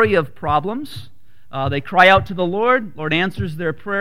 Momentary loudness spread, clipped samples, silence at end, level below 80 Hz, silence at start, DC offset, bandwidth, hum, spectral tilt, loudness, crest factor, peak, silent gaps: 16 LU; under 0.1%; 0 s; -44 dBFS; 0 s; 2%; 16 kHz; none; -6.5 dB/octave; -17 LUFS; 18 dB; 0 dBFS; none